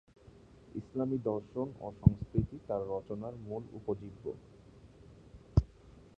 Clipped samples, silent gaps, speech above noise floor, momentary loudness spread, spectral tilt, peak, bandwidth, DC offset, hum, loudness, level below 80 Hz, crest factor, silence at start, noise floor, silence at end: under 0.1%; none; 23 dB; 17 LU; -11 dB/octave; -8 dBFS; 7 kHz; under 0.1%; none; -36 LUFS; -46 dBFS; 28 dB; 0.25 s; -58 dBFS; 0.2 s